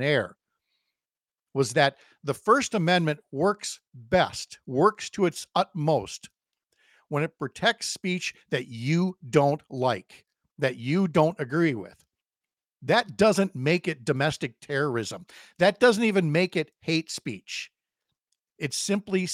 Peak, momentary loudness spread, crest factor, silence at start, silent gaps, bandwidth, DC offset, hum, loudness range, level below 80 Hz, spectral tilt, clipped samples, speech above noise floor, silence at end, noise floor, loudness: -4 dBFS; 12 LU; 22 dB; 0 s; none; 16 kHz; under 0.1%; none; 3 LU; -64 dBFS; -5 dB/octave; under 0.1%; over 64 dB; 0 s; under -90 dBFS; -26 LUFS